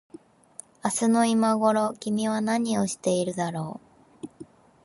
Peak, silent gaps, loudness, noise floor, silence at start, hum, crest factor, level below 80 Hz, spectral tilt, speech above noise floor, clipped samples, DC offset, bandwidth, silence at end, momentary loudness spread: -8 dBFS; none; -25 LUFS; -49 dBFS; 0.85 s; none; 18 dB; -68 dBFS; -5 dB/octave; 25 dB; under 0.1%; under 0.1%; 11.5 kHz; 0.4 s; 22 LU